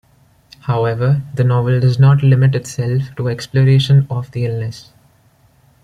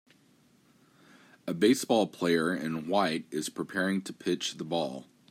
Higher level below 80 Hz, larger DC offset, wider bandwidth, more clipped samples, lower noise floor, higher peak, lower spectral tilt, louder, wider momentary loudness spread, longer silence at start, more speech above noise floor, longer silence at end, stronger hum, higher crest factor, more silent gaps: first, -48 dBFS vs -76 dBFS; neither; second, 9.4 kHz vs 16 kHz; neither; second, -53 dBFS vs -64 dBFS; first, -2 dBFS vs -12 dBFS; first, -7.5 dB/octave vs -4.5 dB/octave; first, -15 LUFS vs -30 LUFS; about the same, 11 LU vs 10 LU; second, 0.65 s vs 1.45 s; first, 39 dB vs 35 dB; first, 1.05 s vs 0.3 s; neither; second, 14 dB vs 20 dB; neither